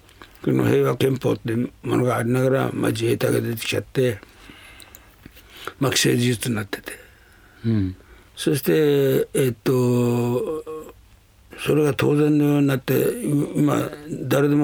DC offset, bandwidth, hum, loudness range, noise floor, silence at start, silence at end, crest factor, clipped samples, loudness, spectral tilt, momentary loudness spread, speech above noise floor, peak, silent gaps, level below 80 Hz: under 0.1%; over 20 kHz; none; 4 LU; -52 dBFS; 0.2 s; 0 s; 16 dB; under 0.1%; -21 LUFS; -6 dB/octave; 12 LU; 31 dB; -6 dBFS; none; -54 dBFS